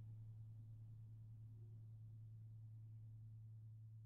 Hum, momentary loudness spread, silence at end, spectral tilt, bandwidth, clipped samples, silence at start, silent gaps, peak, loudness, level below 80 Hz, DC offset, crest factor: none; 2 LU; 0 s; -13.5 dB/octave; 1.3 kHz; under 0.1%; 0 s; none; -50 dBFS; -59 LUFS; -74 dBFS; under 0.1%; 8 dB